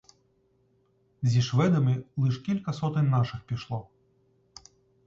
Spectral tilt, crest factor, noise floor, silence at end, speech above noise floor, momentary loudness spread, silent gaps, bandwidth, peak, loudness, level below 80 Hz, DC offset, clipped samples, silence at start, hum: -7.5 dB/octave; 16 dB; -68 dBFS; 1.25 s; 42 dB; 11 LU; none; 7.6 kHz; -12 dBFS; -27 LUFS; -60 dBFS; under 0.1%; under 0.1%; 1.2 s; none